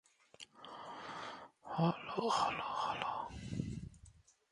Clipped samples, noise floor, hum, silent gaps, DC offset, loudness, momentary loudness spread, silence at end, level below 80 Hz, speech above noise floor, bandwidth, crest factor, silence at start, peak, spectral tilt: under 0.1%; -63 dBFS; none; none; under 0.1%; -40 LUFS; 18 LU; 0.4 s; -62 dBFS; 26 dB; 11.5 kHz; 22 dB; 0.4 s; -18 dBFS; -5.5 dB/octave